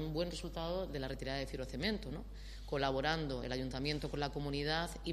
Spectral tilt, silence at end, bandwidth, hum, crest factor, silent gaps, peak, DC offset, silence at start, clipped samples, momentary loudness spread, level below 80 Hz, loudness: -5.5 dB/octave; 0 s; 13 kHz; none; 22 dB; none; -18 dBFS; under 0.1%; 0 s; under 0.1%; 7 LU; -48 dBFS; -39 LUFS